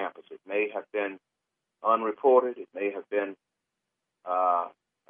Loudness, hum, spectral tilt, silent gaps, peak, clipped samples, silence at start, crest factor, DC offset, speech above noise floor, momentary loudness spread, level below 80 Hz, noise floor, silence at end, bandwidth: -28 LUFS; none; -7.5 dB/octave; none; -8 dBFS; under 0.1%; 0 s; 20 dB; under 0.1%; 58 dB; 15 LU; -88 dBFS; -85 dBFS; 0.4 s; 3.7 kHz